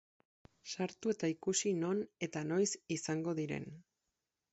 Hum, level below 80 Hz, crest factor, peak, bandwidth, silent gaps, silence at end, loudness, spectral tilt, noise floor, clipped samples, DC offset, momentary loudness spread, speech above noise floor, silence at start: none; -76 dBFS; 18 dB; -22 dBFS; 8 kHz; none; 0.7 s; -37 LUFS; -5.5 dB/octave; -88 dBFS; under 0.1%; under 0.1%; 9 LU; 51 dB; 0.65 s